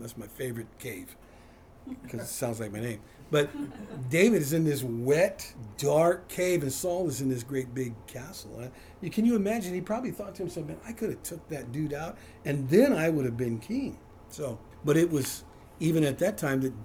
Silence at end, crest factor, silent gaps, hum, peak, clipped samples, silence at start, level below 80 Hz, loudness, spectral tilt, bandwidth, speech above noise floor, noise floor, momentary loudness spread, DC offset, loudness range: 0 s; 20 dB; none; none; -10 dBFS; under 0.1%; 0 s; -58 dBFS; -29 LUFS; -5.5 dB/octave; over 20 kHz; 24 dB; -53 dBFS; 17 LU; under 0.1%; 8 LU